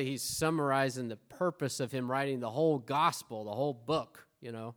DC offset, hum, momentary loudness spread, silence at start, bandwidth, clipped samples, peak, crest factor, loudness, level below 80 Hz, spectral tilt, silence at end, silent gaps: under 0.1%; none; 12 LU; 0 s; over 20 kHz; under 0.1%; -14 dBFS; 20 dB; -33 LUFS; -68 dBFS; -5 dB/octave; 0.05 s; none